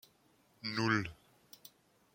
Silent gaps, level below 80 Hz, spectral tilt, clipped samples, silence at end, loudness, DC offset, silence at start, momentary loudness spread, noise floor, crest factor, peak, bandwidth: none; -70 dBFS; -5 dB/octave; under 0.1%; 1 s; -36 LUFS; under 0.1%; 0.65 s; 25 LU; -70 dBFS; 22 dB; -18 dBFS; 16.5 kHz